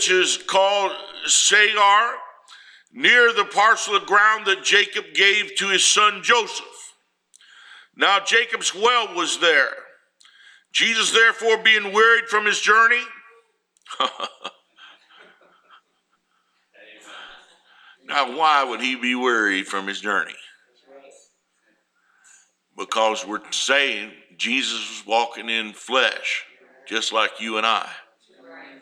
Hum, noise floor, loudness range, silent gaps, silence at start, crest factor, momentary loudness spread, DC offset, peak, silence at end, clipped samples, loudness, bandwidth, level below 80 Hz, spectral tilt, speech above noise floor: none; -69 dBFS; 12 LU; none; 0 s; 20 dB; 13 LU; under 0.1%; -2 dBFS; 0.15 s; under 0.1%; -18 LUFS; 16 kHz; -78 dBFS; 0 dB/octave; 49 dB